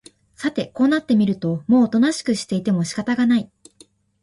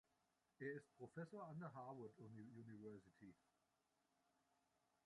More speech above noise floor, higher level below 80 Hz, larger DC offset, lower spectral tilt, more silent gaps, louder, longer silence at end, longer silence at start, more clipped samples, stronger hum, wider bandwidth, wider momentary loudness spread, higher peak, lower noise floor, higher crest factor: first, 35 dB vs 30 dB; first, -58 dBFS vs under -90 dBFS; neither; second, -6 dB/octave vs -8 dB/octave; neither; first, -20 LUFS vs -58 LUFS; second, 0.8 s vs 1.7 s; second, 0.4 s vs 0.6 s; neither; neither; about the same, 11.5 kHz vs 11 kHz; about the same, 8 LU vs 10 LU; first, -6 dBFS vs -40 dBFS; second, -53 dBFS vs -88 dBFS; second, 14 dB vs 20 dB